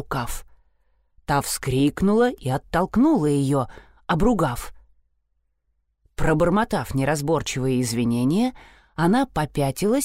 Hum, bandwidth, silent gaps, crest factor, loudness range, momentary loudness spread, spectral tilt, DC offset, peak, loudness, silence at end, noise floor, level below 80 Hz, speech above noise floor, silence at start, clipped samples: none; 16 kHz; none; 14 dB; 4 LU; 10 LU; -6 dB/octave; 0.2%; -8 dBFS; -22 LUFS; 0 s; -71 dBFS; -40 dBFS; 50 dB; 0 s; under 0.1%